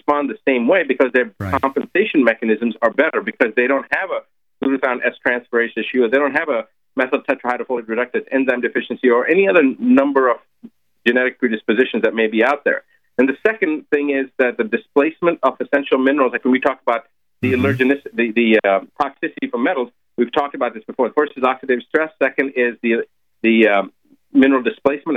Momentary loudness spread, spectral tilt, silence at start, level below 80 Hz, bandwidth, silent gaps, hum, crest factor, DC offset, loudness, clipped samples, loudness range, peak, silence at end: 8 LU; -7.5 dB/octave; 0.1 s; -60 dBFS; 6 kHz; none; none; 16 dB; under 0.1%; -18 LUFS; under 0.1%; 3 LU; -2 dBFS; 0 s